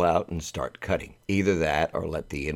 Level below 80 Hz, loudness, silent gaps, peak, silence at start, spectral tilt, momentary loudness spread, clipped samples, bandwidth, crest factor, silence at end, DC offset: -44 dBFS; -28 LUFS; none; -8 dBFS; 0 s; -5.5 dB/octave; 9 LU; under 0.1%; 16.5 kHz; 18 dB; 0 s; under 0.1%